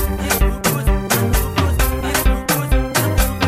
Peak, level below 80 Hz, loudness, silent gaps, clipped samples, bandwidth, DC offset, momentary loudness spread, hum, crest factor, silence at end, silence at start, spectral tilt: -2 dBFS; -20 dBFS; -18 LUFS; none; under 0.1%; 16 kHz; under 0.1%; 2 LU; none; 14 dB; 0 s; 0 s; -4.5 dB/octave